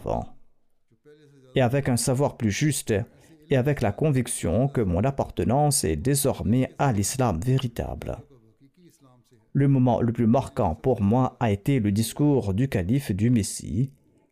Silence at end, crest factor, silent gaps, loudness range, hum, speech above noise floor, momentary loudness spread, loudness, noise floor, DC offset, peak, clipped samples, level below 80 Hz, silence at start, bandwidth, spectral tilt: 0.4 s; 12 dB; none; 3 LU; none; 39 dB; 8 LU; -24 LUFS; -62 dBFS; under 0.1%; -12 dBFS; under 0.1%; -44 dBFS; 0 s; 15.5 kHz; -6 dB/octave